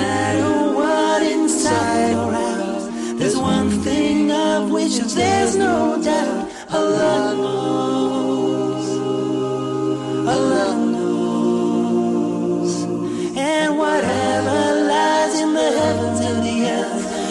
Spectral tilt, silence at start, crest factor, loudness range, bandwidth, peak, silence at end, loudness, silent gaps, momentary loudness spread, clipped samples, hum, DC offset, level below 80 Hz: -4.5 dB/octave; 0 s; 10 dB; 2 LU; 12 kHz; -8 dBFS; 0 s; -19 LUFS; none; 5 LU; under 0.1%; none; under 0.1%; -50 dBFS